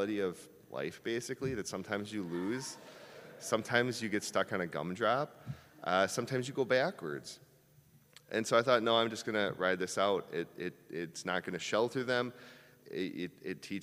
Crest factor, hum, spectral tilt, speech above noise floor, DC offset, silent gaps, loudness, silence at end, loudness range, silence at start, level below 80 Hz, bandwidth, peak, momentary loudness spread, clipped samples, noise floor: 24 dB; none; -4 dB/octave; 29 dB; under 0.1%; none; -35 LUFS; 0 s; 5 LU; 0 s; -76 dBFS; 15.5 kHz; -12 dBFS; 14 LU; under 0.1%; -64 dBFS